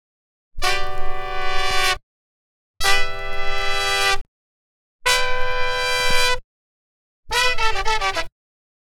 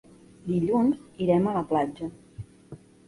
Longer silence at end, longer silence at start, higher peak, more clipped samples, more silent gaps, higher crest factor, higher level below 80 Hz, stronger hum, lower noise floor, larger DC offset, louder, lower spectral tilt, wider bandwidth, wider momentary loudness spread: first, 0.65 s vs 0.3 s; about the same, 0.5 s vs 0.45 s; first, -2 dBFS vs -10 dBFS; neither; first, 2.03-2.74 s, 4.21-4.99 s, 6.44-7.23 s vs none; about the same, 18 dB vs 16 dB; first, -28 dBFS vs -58 dBFS; neither; first, under -90 dBFS vs -48 dBFS; first, 3% vs under 0.1%; first, -21 LUFS vs -26 LUFS; second, -1 dB/octave vs -9 dB/octave; first, 14 kHz vs 11.5 kHz; second, 9 LU vs 21 LU